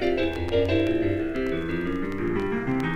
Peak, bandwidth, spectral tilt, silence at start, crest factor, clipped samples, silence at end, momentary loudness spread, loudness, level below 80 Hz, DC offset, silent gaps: -10 dBFS; 9.4 kHz; -7.5 dB/octave; 0 s; 14 dB; under 0.1%; 0 s; 5 LU; -26 LUFS; -40 dBFS; under 0.1%; none